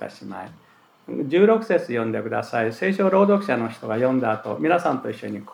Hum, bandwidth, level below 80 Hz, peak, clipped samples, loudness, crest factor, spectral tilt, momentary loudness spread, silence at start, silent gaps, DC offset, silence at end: none; 12 kHz; -78 dBFS; -4 dBFS; under 0.1%; -22 LUFS; 18 dB; -7.5 dB/octave; 16 LU; 0 s; none; under 0.1%; 0 s